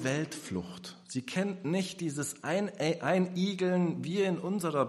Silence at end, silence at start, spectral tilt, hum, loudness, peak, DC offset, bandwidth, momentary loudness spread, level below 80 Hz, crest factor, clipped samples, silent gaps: 0 s; 0 s; -5.5 dB/octave; none; -32 LUFS; -14 dBFS; under 0.1%; 13 kHz; 9 LU; -72 dBFS; 18 dB; under 0.1%; none